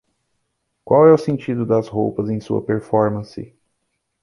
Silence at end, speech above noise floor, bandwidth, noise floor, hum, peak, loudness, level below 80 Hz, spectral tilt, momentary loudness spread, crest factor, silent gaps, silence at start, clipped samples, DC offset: 0.75 s; 56 dB; 11 kHz; -73 dBFS; none; -2 dBFS; -18 LUFS; -54 dBFS; -9 dB/octave; 13 LU; 18 dB; none; 0.85 s; under 0.1%; under 0.1%